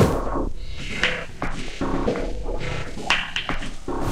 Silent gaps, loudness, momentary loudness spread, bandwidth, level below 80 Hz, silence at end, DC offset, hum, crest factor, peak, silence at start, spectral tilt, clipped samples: none; -26 LUFS; 9 LU; 14.5 kHz; -30 dBFS; 0 s; under 0.1%; none; 22 dB; -2 dBFS; 0 s; -5 dB/octave; under 0.1%